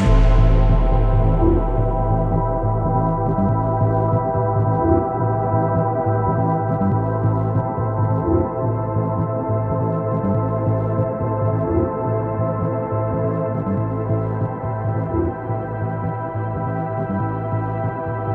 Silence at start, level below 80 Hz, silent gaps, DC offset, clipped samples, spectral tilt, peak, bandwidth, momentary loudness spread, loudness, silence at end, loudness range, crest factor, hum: 0 s; -26 dBFS; none; under 0.1%; under 0.1%; -10.5 dB/octave; -4 dBFS; 4.2 kHz; 6 LU; -20 LUFS; 0 s; 4 LU; 14 dB; none